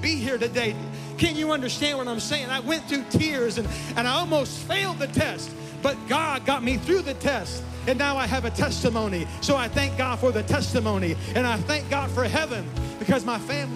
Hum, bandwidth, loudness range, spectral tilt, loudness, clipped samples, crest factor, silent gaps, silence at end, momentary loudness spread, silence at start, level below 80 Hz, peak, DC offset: none; 15.5 kHz; 1 LU; -4.5 dB/octave; -25 LUFS; under 0.1%; 18 dB; none; 0 s; 5 LU; 0 s; -44 dBFS; -8 dBFS; under 0.1%